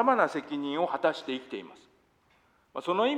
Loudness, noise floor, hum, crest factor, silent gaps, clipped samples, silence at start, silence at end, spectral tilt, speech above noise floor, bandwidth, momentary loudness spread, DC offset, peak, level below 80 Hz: -30 LUFS; -66 dBFS; none; 20 dB; none; under 0.1%; 0 s; 0 s; -5 dB/octave; 38 dB; 11 kHz; 15 LU; under 0.1%; -10 dBFS; -78 dBFS